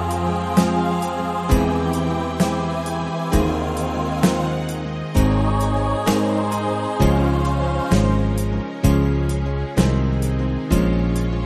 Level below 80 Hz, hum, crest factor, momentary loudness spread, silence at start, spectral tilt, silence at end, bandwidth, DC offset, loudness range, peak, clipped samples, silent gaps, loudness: -26 dBFS; none; 18 dB; 5 LU; 0 s; -6.5 dB/octave; 0 s; 13.5 kHz; under 0.1%; 2 LU; -2 dBFS; under 0.1%; none; -20 LUFS